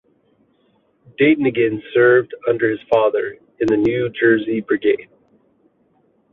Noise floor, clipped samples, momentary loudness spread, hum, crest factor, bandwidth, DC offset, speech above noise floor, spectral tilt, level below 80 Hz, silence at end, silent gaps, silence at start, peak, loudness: -61 dBFS; under 0.1%; 8 LU; none; 16 dB; 6.6 kHz; under 0.1%; 44 dB; -8 dB/octave; -58 dBFS; 1.3 s; none; 1.2 s; -2 dBFS; -17 LUFS